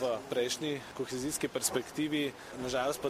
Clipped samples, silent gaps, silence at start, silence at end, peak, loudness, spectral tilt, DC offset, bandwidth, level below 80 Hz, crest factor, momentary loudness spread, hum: under 0.1%; none; 0 s; 0 s; -14 dBFS; -34 LUFS; -3 dB/octave; under 0.1%; 15.5 kHz; -64 dBFS; 20 dB; 6 LU; none